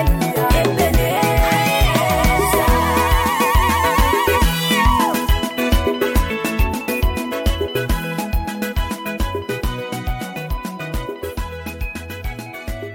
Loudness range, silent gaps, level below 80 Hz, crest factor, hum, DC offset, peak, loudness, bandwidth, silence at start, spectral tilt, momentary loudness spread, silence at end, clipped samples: 10 LU; none; -22 dBFS; 12 dB; none; under 0.1%; -6 dBFS; -18 LUFS; 17 kHz; 0 s; -4.5 dB/octave; 12 LU; 0 s; under 0.1%